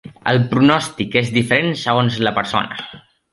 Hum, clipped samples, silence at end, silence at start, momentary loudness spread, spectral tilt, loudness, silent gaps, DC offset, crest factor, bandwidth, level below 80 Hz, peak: none; under 0.1%; 0.35 s; 0.05 s; 8 LU; -5.5 dB/octave; -17 LUFS; none; under 0.1%; 16 dB; 11.5 kHz; -52 dBFS; -2 dBFS